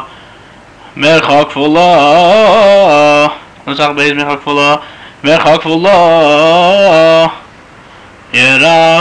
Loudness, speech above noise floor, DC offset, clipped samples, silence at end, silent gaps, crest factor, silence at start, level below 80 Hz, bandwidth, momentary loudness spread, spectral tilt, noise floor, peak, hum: -7 LUFS; 29 dB; 0.8%; under 0.1%; 0 s; none; 8 dB; 0 s; -46 dBFS; 10 kHz; 8 LU; -4.5 dB/octave; -36 dBFS; 0 dBFS; none